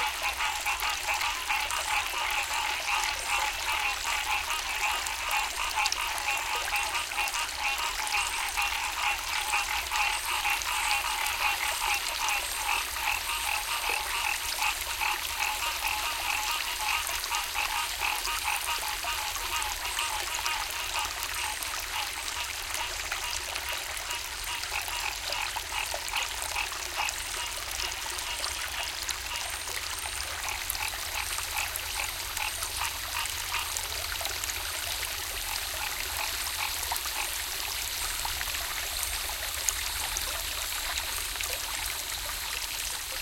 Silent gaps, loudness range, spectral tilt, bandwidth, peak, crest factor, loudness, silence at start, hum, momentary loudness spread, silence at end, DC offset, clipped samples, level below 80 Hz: none; 4 LU; 0.5 dB/octave; 17 kHz; -6 dBFS; 26 dB; -29 LUFS; 0 s; none; 4 LU; 0 s; under 0.1%; under 0.1%; -48 dBFS